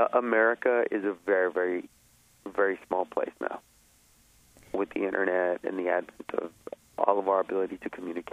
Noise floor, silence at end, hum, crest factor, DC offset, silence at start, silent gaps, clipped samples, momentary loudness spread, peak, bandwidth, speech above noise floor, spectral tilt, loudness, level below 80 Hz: -62 dBFS; 0.1 s; none; 22 dB; under 0.1%; 0 s; none; under 0.1%; 13 LU; -6 dBFS; 14.5 kHz; 33 dB; -6 dB/octave; -29 LUFS; -70 dBFS